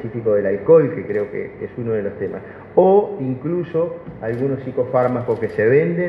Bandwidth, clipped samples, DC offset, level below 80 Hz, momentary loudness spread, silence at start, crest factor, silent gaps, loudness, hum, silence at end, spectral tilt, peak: 5 kHz; under 0.1%; under 0.1%; -54 dBFS; 14 LU; 0 s; 18 dB; none; -19 LUFS; none; 0 s; -10.5 dB/octave; 0 dBFS